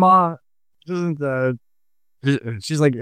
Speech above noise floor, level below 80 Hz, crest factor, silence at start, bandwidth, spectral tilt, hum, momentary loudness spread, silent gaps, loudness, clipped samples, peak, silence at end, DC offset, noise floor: 66 dB; -66 dBFS; 16 dB; 0 s; 14 kHz; -6.5 dB/octave; none; 12 LU; none; -21 LUFS; under 0.1%; -4 dBFS; 0 s; under 0.1%; -84 dBFS